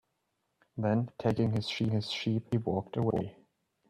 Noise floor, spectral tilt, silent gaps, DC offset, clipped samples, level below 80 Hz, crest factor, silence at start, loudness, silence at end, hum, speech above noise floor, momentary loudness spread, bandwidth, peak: -80 dBFS; -7 dB/octave; none; under 0.1%; under 0.1%; -62 dBFS; 16 dB; 0.75 s; -32 LUFS; 0.6 s; none; 49 dB; 5 LU; 10 kHz; -16 dBFS